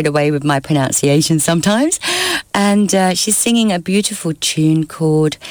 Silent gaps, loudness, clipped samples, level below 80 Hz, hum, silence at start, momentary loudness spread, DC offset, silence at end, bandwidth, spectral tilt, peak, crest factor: none; -14 LUFS; under 0.1%; -50 dBFS; none; 0 s; 3 LU; under 0.1%; 0 s; over 20 kHz; -4 dB/octave; -2 dBFS; 12 dB